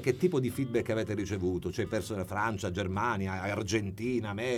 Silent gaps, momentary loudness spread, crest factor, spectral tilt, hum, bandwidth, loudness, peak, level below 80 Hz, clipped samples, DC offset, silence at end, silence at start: none; 4 LU; 18 dB; -6 dB/octave; none; 16.5 kHz; -32 LUFS; -14 dBFS; -56 dBFS; under 0.1%; under 0.1%; 0 s; 0 s